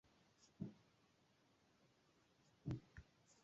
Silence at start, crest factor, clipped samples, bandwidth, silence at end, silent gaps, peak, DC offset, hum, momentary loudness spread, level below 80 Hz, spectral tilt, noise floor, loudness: 0.4 s; 22 dB; under 0.1%; 7.6 kHz; 0.1 s; none; -36 dBFS; under 0.1%; none; 14 LU; -72 dBFS; -8 dB/octave; -78 dBFS; -54 LUFS